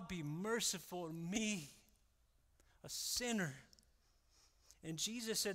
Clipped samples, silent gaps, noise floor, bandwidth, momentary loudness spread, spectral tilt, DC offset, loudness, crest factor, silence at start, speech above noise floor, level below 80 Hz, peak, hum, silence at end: under 0.1%; none; -75 dBFS; 16 kHz; 14 LU; -3 dB/octave; under 0.1%; -42 LUFS; 20 dB; 0 s; 33 dB; -70 dBFS; -24 dBFS; none; 0 s